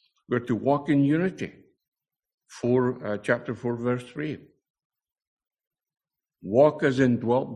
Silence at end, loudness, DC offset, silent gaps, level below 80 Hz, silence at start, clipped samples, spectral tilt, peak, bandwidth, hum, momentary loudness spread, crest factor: 0 s; -25 LUFS; under 0.1%; 1.88-1.92 s, 2.34-2.38 s, 4.70-4.74 s, 4.85-4.90 s, 5.27-5.37 s, 5.67-5.71 s; -64 dBFS; 0.3 s; under 0.1%; -7.5 dB/octave; -6 dBFS; 10.5 kHz; none; 13 LU; 20 dB